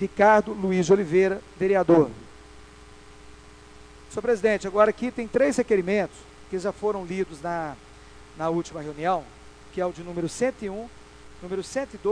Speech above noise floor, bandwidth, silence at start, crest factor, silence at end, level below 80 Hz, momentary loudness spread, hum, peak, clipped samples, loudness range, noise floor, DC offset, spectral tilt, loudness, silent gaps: 24 dB; 11 kHz; 0 s; 20 dB; 0 s; -52 dBFS; 15 LU; none; -4 dBFS; under 0.1%; 6 LU; -48 dBFS; under 0.1%; -6 dB/octave; -25 LUFS; none